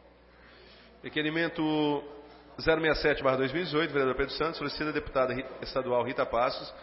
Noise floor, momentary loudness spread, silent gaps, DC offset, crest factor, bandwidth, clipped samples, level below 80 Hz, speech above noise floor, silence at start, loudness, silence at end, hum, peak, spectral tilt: -56 dBFS; 9 LU; none; under 0.1%; 18 dB; 5.8 kHz; under 0.1%; -52 dBFS; 27 dB; 0.6 s; -29 LUFS; 0 s; 60 Hz at -60 dBFS; -12 dBFS; -9 dB/octave